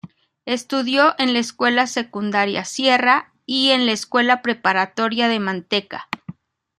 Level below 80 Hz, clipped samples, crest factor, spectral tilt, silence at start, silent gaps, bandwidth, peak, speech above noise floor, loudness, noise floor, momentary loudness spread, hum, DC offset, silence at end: -68 dBFS; under 0.1%; 18 dB; -3 dB/octave; 0.05 s; none; 13 kHz; -2 dBFS; 21 dB; -18 LUFS; -40 dBFS; 10 LU; none; under 0.1%; 0.45 s